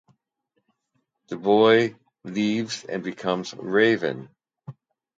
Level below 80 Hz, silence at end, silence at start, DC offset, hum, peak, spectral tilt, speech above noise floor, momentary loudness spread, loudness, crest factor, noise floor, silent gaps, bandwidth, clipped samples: -70 dBFS; 0.45 s; 1.3 s; under 0.1%; none; -6 dBFS; -5 dB/octave; 53 dB; 15 LU; -23 LUFS; 20 dB; -75 dBFS; none; 7.8 kHz; under 0.1%